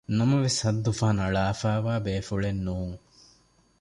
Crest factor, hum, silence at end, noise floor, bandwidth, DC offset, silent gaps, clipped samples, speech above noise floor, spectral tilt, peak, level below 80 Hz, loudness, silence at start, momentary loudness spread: 14 dB; none; 0.85 s; -62 dBFS; 11.5 kHz; under 0.1%; none; under 0.1%; 37 dB; -5.5 dB/octave; -12 dBFS; -46 dBFS; -27 LUFS; 0.1 s; 9 LU